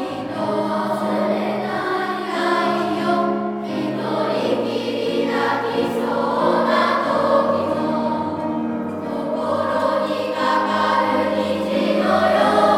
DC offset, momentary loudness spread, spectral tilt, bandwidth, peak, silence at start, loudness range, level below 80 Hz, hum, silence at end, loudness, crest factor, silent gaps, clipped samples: under 0.1%; 7 LU; -6 dB/octave; 16 kHz; -4 dBFS; 0 s; 2 LU; -62 dBFS; none; 0 s; -20 LUFS; 16 dB; none; under 0.1%